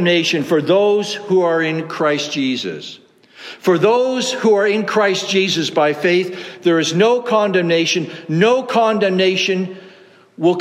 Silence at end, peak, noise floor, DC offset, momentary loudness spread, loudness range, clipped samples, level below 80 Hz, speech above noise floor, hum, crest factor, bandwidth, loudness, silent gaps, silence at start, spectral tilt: 0 s; -2 dBFS; -45 dBFS; under 0.1%; 8 LU; 2 LU; under 0.1%; -70 dBFS; 30 dB; none; 14 dB; 14.5 kHz; -16 LUFS; none; 0 s; -4.5 dB/octave